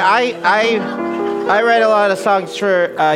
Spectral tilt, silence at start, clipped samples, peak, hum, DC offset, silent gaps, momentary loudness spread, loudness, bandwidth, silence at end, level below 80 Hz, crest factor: -4.5 dB/octave; 0 s; under 0.1%; -2 dBFS; none; under 0.1%; none; 7 LU; -15 LUFS; 14.5 kHz; 0 s; -62 dBFS; 14 dB